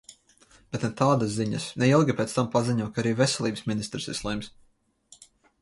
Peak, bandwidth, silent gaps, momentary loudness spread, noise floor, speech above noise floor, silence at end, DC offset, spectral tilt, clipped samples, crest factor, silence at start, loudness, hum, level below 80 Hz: -8 dBFS; 11.5 kHz; none; 10 LU; -58 dBFS; 33 dB; 1.1 s; under 0.1%; -5.5 dB/octave; under 0.1%; 20 dB; 0.1 s; -26 LUFS; none; -56 dBFS